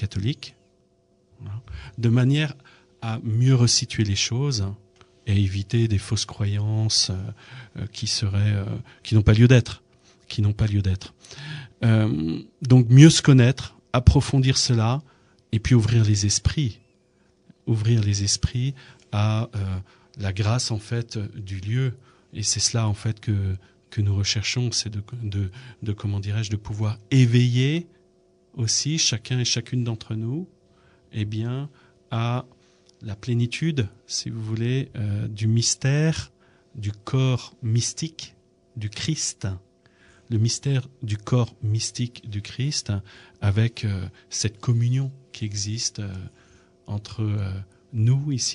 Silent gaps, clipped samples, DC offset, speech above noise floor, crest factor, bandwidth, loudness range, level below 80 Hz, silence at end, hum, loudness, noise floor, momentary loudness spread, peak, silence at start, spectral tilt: none; under 0.1%; under 0.1%; 40 dB; 22 dB; 10.5 kHz; 9 LU; -42 dBFS; 0 s; none; -23 LUFS; -63 dBFS; 16 LU; 0 dBFS; 0 s; -5 dB/octave